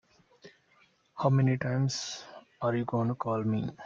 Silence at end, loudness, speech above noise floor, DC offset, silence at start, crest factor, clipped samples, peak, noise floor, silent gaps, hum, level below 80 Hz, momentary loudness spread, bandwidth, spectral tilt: 0 s; -30 LUFS; 37 dB; under 0.1%; 0.45 s; 18 dB; under 0.1%; -12 dBFS; -66 dBFS; none; none; -66 dBFS; 14 LU; 7.6 kHz; -6.5 dB/octave